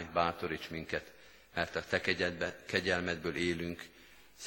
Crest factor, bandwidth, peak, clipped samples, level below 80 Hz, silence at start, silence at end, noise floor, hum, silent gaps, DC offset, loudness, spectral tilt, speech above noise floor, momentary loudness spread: 24 dB; 17 kHz; -12 dBFS; under 0.1%; -60 dBFS; 0 s; 0 s; -56 dBFS; none; none; under 0.1%; -35 LUFS; -4.5 dB/octave; 20 dB; 10 LU